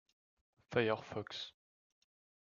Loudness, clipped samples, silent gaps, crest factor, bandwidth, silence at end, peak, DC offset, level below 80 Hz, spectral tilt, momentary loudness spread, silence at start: -39 LUFS; under 0.1%; none; 26 dB; 7.4 kHz; 0.95 s; -16 dBFS; under 0.1%; -78 dBFS; -5.5 dB/octave; 11 LU; 0.7 s